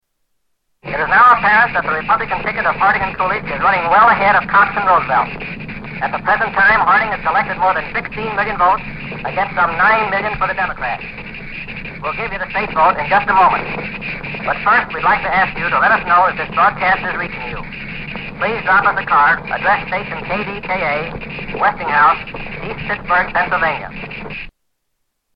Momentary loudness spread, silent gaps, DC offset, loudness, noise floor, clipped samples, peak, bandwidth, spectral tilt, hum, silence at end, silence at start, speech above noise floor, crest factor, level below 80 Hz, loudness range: 15 LU; none; under 0.1%; -15 LUFS; -70 dBFS; under 0.1%; -2 dBFS; 5.6 kHz; -7.5 dB/octave; none; 0.85 s; 0.85 s; 55 dB; 14 dB; -38 dBFS; 4 LU